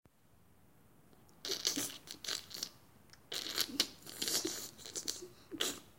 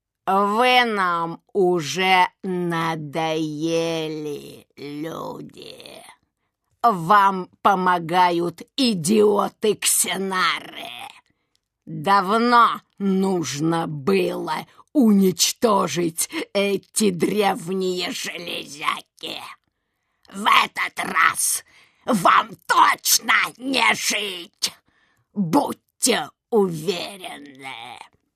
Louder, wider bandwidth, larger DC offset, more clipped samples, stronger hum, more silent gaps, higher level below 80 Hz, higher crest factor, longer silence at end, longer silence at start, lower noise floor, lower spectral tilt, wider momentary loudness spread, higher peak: second, -38 LUFS vs -20 LUFS; first, 17 kHz vs 14 kHz; neither; neither; neither; neither; second, -74 dBFS vs -68 dBFS; first, 30 dB vs 22 dB; second, 0.05 s vs 0.35 s; first, 1.2 s vs 0.25 s; second, -68 dBFS vs -74 dBFS; second, -0.5 dB/octave vs -3.5 dB/octave; second, 10 LU vs 18 LU; second, -12 dBFS vs 0 dBFS